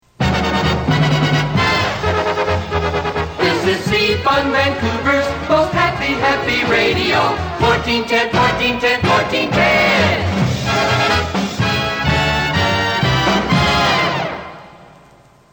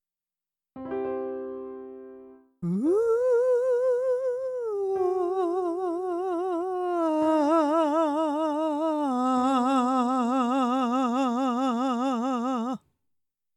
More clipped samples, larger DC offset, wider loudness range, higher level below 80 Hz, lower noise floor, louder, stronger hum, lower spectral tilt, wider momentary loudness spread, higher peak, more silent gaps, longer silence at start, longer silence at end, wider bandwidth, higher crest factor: neither; neither; about the same, 2 LU vs 3 LU; first, -34 dBFS vs -72 dBFS; second, -47 dBFS vs under -90 dBFS; first, -15 LUFS vs -26 LUFS; neither; second, -5 dB/octave vs -6.5 dB/octave; second, 5 LU vs 11 LU; first, -2 dBFS vs -12 dBFS; neither; second, 0.2 s vs 0.75 s; about the same, 0.7 s vs 0.8 s; first, over 20 kHz vs 11.5 kHz; about the same, 14 dB vs 14 dB